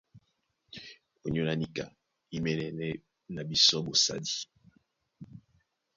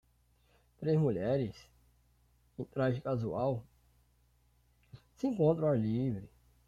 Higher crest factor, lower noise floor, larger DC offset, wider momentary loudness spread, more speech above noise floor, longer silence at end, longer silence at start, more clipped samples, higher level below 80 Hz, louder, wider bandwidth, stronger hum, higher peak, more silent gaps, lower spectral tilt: about the same, 24 dB vs 20 dB; first, -77 dBFS vs -70 dBFS; neither; first, 24 LU vs 12 LU; first, 47 dB vs 38 dB; first, 0.55 s vs 0.4 s; second, 0.15 s vs 0.8 s; neither; about the same, -62 dBFS vs -64 dBFS; first, -29 LUFS vs -34 LUFS; about the same, 7.4 kHz vs 7.4 kHz; neither; first, -10 dBFS vs -16 dBFS; neither; second, -3.5 dB/octave vs -9.5 dB/octave